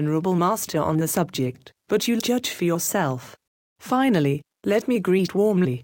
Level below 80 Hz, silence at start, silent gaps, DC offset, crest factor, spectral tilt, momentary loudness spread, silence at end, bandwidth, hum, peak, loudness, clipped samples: -60 dBFS; 0 s; 3.47-3.76 s; under 0.1%; 14 dB; -5.5 dB/octave; 7 LU; 0 s; 17 kHz; none; -10 dBFS; -23 LUFS; under 0.1%